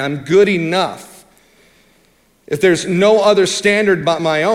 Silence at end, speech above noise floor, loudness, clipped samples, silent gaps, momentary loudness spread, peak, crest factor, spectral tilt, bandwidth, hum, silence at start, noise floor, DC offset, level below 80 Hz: 0 s; 41 dB; -14 LUFS; under 0.1%; none; 7 LU; 0 dBFS; 14 dB; -4.5 dB/octave; 14 kHz; none; 0 s; -55 dBFS; under 0.1%; -56 dBFS